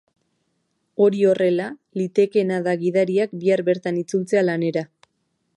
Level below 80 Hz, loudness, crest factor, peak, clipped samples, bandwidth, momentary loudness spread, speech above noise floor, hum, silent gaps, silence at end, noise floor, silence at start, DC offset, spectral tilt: -72 dBFS; -21 LUFS; 16 dB; -6 dBFS; under 0.1%; 11.5 kHz; 10 LU; 52 dB; none; none; 0.7 s; -72 dBFS; 1 s; under 0.1%; -7 dB/octave